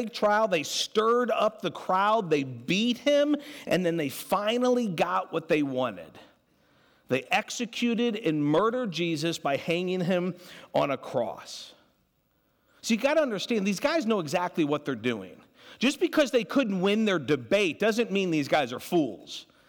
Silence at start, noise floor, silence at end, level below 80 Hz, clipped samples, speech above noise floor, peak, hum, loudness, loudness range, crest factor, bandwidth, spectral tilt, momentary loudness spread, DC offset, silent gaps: 0 s; -70 dBFS; 0.25 s; -70 dBFS; under 0.1%; 44 dB; -14 dBFS; none; -27 LUFS; 4 LU; 14 dB; 19 kHz; -5 dB/octave; 8 LU; under 0.1%; none